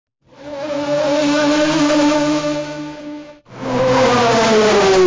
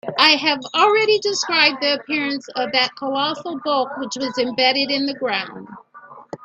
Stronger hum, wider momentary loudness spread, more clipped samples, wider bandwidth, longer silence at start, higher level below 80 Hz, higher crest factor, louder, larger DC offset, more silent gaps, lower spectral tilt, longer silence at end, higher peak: neither; first, 17 LU vs 10 LU; neither; second, 7.6 kHz vs 9.2 kHz; first, 0.4 s vs 0.05 s; first, -46 dBFS vs -68 dBFS; second, 10 dB vs 20 dB; first, -15 LUFS vs -18 LUFS; neither; neither; first, -4.5 dB/octave vs -2 dB/octave; about the same, 0 s vs 0.1 s; second, -6 dBFS vs 0 dBFS